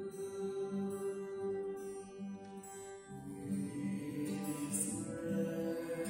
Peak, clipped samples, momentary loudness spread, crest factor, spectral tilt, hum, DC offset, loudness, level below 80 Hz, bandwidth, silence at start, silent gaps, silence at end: -22 dBFS; under 0.1%; 11 LU; 18 dB; -5.5 dB/octave; none; under 0.1%; -41 LUFS; -72 dBFS; 16 kHz; 0 s; none; 0 s